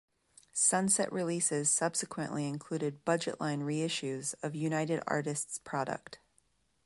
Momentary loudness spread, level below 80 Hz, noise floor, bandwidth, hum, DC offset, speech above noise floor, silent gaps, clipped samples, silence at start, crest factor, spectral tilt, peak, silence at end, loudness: 9 LU; -74 dBFS; -73 dBFS; 12 kHz; none; under 0.1%; 40 dB; none; under 0.1%; 0.55 s; 18 dB; -3.5 dB/octave; -16 dBFS; 0.7 s; -33 LUFS